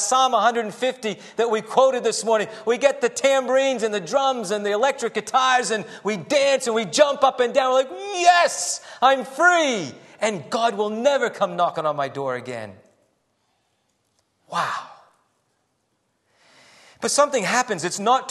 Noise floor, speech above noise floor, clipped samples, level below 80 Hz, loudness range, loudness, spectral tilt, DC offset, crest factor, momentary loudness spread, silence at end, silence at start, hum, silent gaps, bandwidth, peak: -71 dBFS; 50 dB; under 0.1%; -76 dBFS; 14 LU; -21 LUFS; -2.5 dB/octave; under 0.1%; 20 dB; 10 LU; 0 s; 0 s; none; none; 12.5 kHz; -2 dBFS